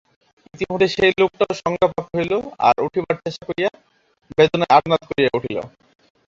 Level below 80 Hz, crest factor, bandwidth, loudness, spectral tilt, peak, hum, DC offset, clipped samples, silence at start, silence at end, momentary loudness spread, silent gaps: -52 dBFS; 18 dB; 7.6 kHz; -19 LUFS; -5.5 dB/octave; 0 dBFS; none; under 0.1%; under 0.1%; 0.55 s; 0.6 s; 11 LU; none